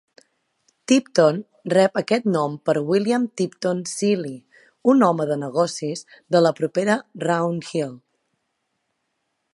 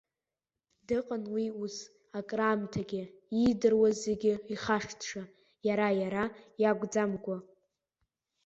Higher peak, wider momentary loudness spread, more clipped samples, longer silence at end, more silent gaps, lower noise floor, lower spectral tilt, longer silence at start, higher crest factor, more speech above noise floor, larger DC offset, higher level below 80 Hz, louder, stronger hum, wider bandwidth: first, -2 dBFS vs -14 dBFS; about the same, 11 LU vs 13 LU; neither; first, 1.55 s vs 1 s; neither; second, -75 dBFS vs under -90 dBFS; about the same, -5.5 dB/octave vs -5.5 dB/octave; about the same, 0.9 s vs 0.9 s; about the same, 20 dB vs 18 dB; second, 54 dB vs over 59 dB; neither; second, -74 dBFS vs -64 dBFS; first, -21 LUFS vs -32 LUFS; neither; first, 11.5 kHz vs 8 kHz